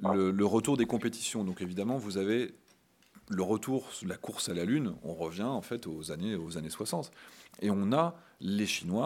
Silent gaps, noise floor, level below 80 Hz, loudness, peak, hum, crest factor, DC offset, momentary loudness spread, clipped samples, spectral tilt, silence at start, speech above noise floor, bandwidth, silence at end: none; -65 dBFS; -70 dBFS; -33 LUFS; -14 dBFS; none; 20 dB; under 0.1%; 11 LU; under 0.1%; -5 dB/octave; 0 s; 33 dB; 16.5 kHz; 0 s